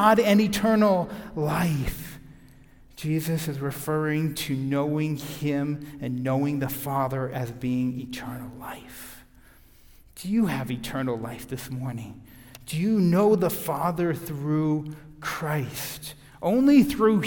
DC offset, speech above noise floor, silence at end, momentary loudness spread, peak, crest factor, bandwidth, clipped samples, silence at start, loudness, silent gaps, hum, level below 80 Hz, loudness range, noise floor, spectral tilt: under 0.1%; 28 dB; 0 s; 18 LU; -6 dBFS; 20 dB; 18 kHz; under 0.1%; 0 s; -26 LUFS; none; none; -50 dBFS; 6 LU; -53 dBFS; -6.5 dB/octave